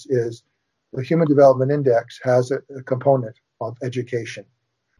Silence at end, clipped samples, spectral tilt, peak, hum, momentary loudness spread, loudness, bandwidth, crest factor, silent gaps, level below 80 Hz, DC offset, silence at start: 0.6 s; under 0.1%; -7.5 dB/octave; -2 dBFS; none; 18 LU; -20 LUFS; 11 kHz; 18 dB; none; -68 dBFS; under 0.1%; 0 s